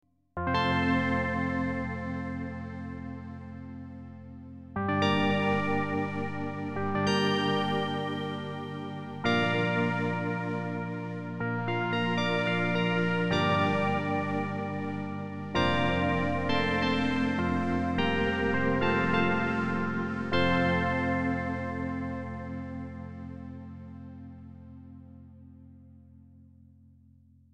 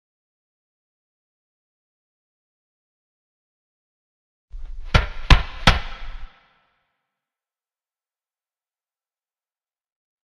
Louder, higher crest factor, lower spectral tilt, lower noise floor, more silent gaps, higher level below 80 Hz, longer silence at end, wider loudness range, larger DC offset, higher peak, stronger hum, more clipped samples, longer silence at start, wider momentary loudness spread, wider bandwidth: second, -29 LUFS vs -20 LUFS; second, 18 dB vs 26 dB; first, -6.5 dB/octave vs -4.5 dB/octave; second, -59 dBFS vs under -90 dBFS; neither; second, -54 dBFS vs -30 dBFS; second, 1.35 s vs 4 s; first, 11 LU vs 7 LU; neither; second, -12 dBFS vs 0 dBFS; neither; neither; second, 0.35 s vs 4.55 s; second, 17 LU vs 23 LU; second, 10 kHz vs 12 kHz